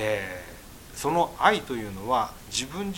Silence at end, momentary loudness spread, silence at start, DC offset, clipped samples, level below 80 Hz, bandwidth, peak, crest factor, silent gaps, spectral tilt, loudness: 0 s; 18 LU; 0 s; under 0.1%; under 0.1%; -50 dBFS; 17 kHz; -4 dBFS; 24 dB; none; -3.5 dB/octave; -27 LUFS